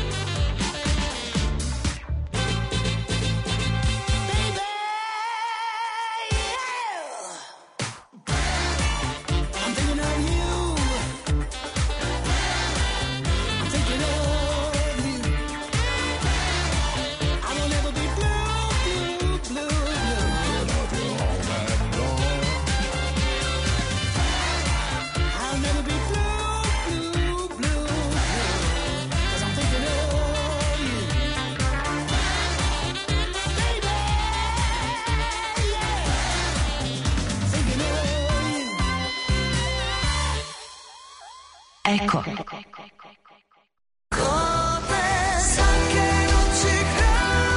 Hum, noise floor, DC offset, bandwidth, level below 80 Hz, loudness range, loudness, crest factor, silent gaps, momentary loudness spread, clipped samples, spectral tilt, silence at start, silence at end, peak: none; -58 dBFS; under 0.1%; 11 kHz; -28 dBFS; 3 LU; -24 LUFS; 16 dB; none; 6 LU; under 0.1%; -4 dB/octave; 0 s; 0 s; -8 dBFS